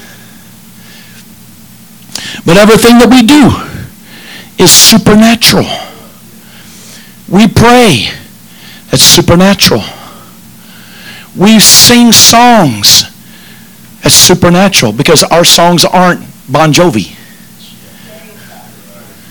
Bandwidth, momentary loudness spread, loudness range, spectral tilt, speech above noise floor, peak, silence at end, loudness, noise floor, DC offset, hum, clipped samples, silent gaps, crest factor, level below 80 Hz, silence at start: over 20 kHz; 18 LU; 5 LU; -3 dB/octave; 30 dB; 0 dBFS; 2.2 s; -3 LUFS; -34 dBFS; under 0.1%; 60 Hz at -35 dBFS; 10%; none; 8 dB; -32 dBFS; 2.15 s